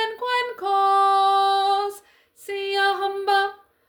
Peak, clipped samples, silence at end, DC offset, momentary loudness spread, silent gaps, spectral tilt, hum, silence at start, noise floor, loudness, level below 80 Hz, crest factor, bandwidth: -8 dBFS; under 0.1%; 0.35 s; under 0.1%; 11 LU; none; -1 dB/octave; none; 0 s; -51 dBFS; -21 LUFS; -72 dBFS; 14 dB; 19.5 kHz